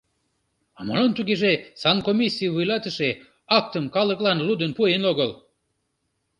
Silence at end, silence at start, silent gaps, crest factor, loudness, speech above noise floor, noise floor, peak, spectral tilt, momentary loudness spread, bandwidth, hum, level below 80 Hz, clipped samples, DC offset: 1.05 s; 0.8 s; none; 20 dB; -22 LUFS; 52 dB; -74 dBFS; -4 dBFS; -6 dB/octave; 6 LU; 10.5 kHz; none; -62 dBFS; under 0.1%; under 0.1%